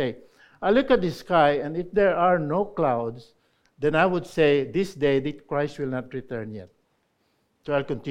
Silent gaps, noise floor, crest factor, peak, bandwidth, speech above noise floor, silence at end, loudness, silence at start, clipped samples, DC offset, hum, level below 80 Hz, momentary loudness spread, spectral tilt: none; -70 dBFS; 18 dB; -6 dBFS; 13 kHz; 46 dB; 0 s; -24 LUFS; 0 s; under 0.1%; under 0.1%; none; -52 dBFS; 14 LU; -7 dB/octave